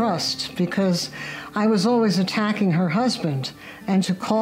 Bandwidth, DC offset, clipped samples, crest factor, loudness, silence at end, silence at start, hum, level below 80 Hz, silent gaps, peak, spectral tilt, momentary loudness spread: 16 kHz; under 0.1%; under 0.1%; 16 dB; -22 LUFS; 0 s; 0 s; none; -60 dBFS; none; -6 dBFS; -5.5 dB/octave; 10 LU